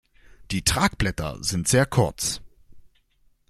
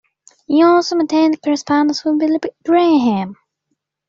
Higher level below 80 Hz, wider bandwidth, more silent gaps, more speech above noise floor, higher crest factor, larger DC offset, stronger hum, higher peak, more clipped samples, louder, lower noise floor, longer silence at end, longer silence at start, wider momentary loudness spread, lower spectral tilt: first, -40 dBFS vs -62 dBFS; first, 16 kHz vs 7.6 kHz; neither; second, 39 dB vs 58 dB; first, 20 dB vs 12 dB; neither; neither; about the same, -6 dBFS vs -4 dBFS; neither; second, -23 LUFS vs -15 LUFS; second, -62 dBFS vs -72 dBFS; about the same, 0.7 s vs 0.75 s; about the same, 0.4 s vs 0.5 s; about the same, 8 LU vs 7 LU; about the same, -4 dB/octave vs -5 dB/octave